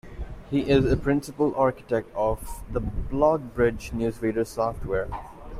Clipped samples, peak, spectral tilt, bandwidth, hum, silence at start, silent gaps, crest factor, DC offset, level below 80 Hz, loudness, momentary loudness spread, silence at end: under 0.1%; -8 dBFS; -7 dB/octave; 15.5 kHz; none; 0.05 s; none; 18 dB; under 0.1%; -38 dBFS; -26 LUFS; 11 LU; 0 s